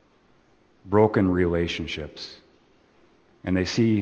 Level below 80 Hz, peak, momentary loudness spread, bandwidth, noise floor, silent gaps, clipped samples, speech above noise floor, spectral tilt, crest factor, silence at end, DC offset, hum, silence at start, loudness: -48 dBFS; -4 dBFS; 17 LU; 8.4 kHz; -60 dBFS; none; under 0.1%; 37 dB; -6.5 dB/octave; 20 dB; 0 s; under 0.1%; none; 0.85 s; -24 LUFS